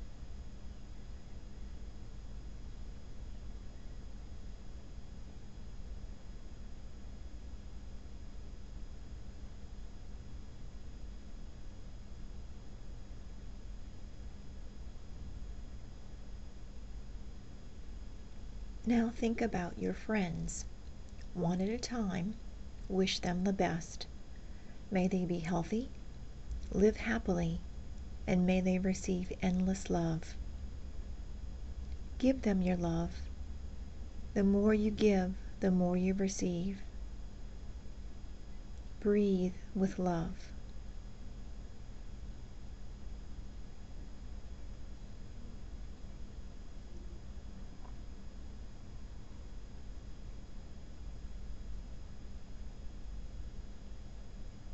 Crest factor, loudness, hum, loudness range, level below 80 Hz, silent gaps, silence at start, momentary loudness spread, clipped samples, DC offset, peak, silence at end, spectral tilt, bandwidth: 22 dB; -36 LUFS; none; 18 LU; -46 dBFS; none; 0 s; 20 LU; under 0.1%; 0.4%; -18 dBFS; 0 s; -6.5 dB/octave; 8.2 kHz